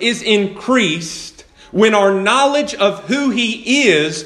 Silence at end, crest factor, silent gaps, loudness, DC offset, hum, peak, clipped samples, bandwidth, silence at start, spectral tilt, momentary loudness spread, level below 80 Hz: 0 s; 16 dB; none; -14 LUFS; under 0.1%; none; 0 dBFS; under 0.1%; 12.5 kHz; 0 s; -3.5 dB/octave; 11 LU; -54 dBFS